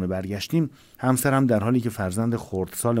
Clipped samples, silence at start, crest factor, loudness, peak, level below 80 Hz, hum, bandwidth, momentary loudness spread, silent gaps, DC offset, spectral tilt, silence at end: under 0.1%; 0 s; 16 dB; -24 LUFS; -8 dBFS; -56 dBFS; none; 16 kHz; 8 LU; none; under 0.1%; -6 dB/octave; 0 s